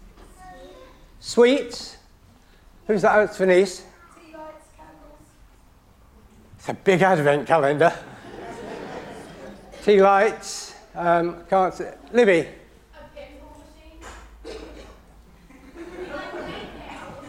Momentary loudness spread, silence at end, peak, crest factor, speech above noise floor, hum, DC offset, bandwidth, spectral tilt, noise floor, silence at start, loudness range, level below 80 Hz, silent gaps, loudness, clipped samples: 25 LU; 0 s; -4 dBFS; 20 dB; 34 dB; none; under 0.1%; 15 kHz; -5 dB/octave; -53 dBFS; 0.45 s; 17 LU; -52 dBFS; none; -20 LUFS; under 0.1%